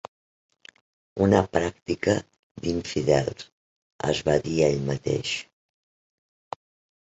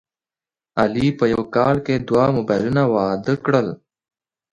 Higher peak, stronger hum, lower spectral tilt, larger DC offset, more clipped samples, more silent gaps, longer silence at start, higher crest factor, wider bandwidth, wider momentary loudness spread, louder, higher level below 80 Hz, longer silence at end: about the same, -4 dBFS vs -2 dBFS; neither; second, -5.5 dB/octave vs -8 dB/octave; neither; neither; first, 2.39-2.55 s, 3.52-3.99 s vs none; first, 1.15 s vs 0.75 s; first, 24 dB vs 18 dB; second, 8.2 kHz vs 10.5 kHz; first, 20 LU vs 4 LU; second, -25 LUFS vs -19 LUFS; about the same, -50 dBFS vs -50 dBFS; first, 1.6 s vs 0.8 s